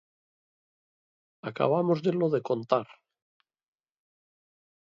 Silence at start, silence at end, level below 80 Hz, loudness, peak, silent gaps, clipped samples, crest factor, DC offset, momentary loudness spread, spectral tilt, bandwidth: 1.45 s; 1.95 s; -78 dBFS; -27 LUFS; -8 dBFS; none; under 0.1%; 24 dB; under 0.1%; 15 LU; -8.5 dB/octave; 7.4 kHz